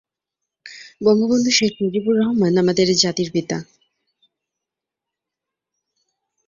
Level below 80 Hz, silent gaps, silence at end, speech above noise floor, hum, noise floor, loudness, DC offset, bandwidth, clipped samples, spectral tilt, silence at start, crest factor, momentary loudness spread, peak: -60 dBFS; none; 2.85 s; 68 dB; none; -85 dBFS; -18 LUFS; under 0.1%; 7.6 kHz; under 0.1%; -4.5 dB/octave; 0.65 s; 18 dB; 13 LU; -2 dBFS